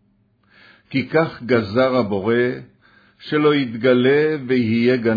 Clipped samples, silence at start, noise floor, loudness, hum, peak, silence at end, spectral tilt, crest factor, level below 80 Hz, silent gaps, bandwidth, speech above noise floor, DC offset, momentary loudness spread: under 0.1%; 0.9 s; -60 dBFS; -18 LUFS; none; -4 dBFS; 0 s; -8.5 dB/octave; 14 dB; -60 dBFS; none; 5 kHz; 43 dB; under 0.1%; 8 LU